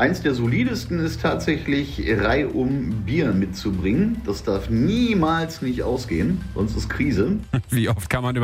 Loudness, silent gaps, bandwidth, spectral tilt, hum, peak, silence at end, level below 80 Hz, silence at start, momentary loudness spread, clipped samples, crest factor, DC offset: -22 LUFS; none; 16 kHz; -6.5 dB/octave; none; -6 dBFS; 0 s; -36 dBFS; 0 s; 5 LU; under 0.1%; 16 dB; under 0.1%